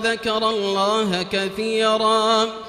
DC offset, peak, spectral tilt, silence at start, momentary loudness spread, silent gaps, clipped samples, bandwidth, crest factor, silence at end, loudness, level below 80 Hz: under 0.1%; -6 dBFS; -3.5 dB/octave; 0 s; 5 LU; none; under 0.1%; 14 kHz; 14 dB; 0 s; -20 LUFS; -56 dBFS